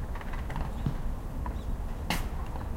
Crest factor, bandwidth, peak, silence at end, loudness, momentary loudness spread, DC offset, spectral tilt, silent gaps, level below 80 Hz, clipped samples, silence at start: 18 dB; 16.5 kHz; -14 dBFS; 0 s; -36 LUFS; 5 LU; under 0.1%; -5.5 dB/octave; none; -34 dBFS; under 0.1%; 0 s